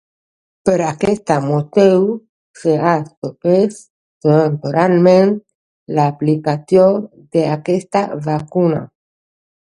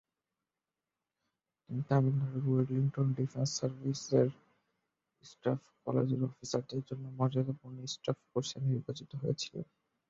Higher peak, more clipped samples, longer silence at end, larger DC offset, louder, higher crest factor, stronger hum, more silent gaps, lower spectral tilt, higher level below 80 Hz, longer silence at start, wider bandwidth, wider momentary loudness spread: first, 0 dBFS vs -16 dBFS; neither; first, 0.8 s vs 0.45 s; neither; first, -15 LUFS vs -35 LUFS; about the same, 16 dB vs 20 dB; neither; first, 2.29-2.54 s, 3.17-3.22 s, 3.90-4.21 s, 5.55-5.86 s vs none; about the same, -7.5 dB/octave vs -6.5 dB/octave; first, -56 dBFS vs -72 dBFS; second, 0.65 s vs 1.7 s; first, 11 kHz vs 7.8 kHz; about the same, 9 LU vs 11 LU